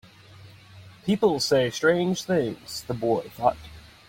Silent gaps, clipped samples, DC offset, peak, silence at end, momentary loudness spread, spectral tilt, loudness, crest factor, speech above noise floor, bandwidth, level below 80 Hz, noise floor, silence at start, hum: none; under 0.1%; under 0.1%; -6 dBFS; 0.3 s; 13 LU; -5 dB/octave; -25 LUFS; 20 dB; 24 dB; 16.5 kHz; -56 dBFS; -49 dBFS; 0.4 s; none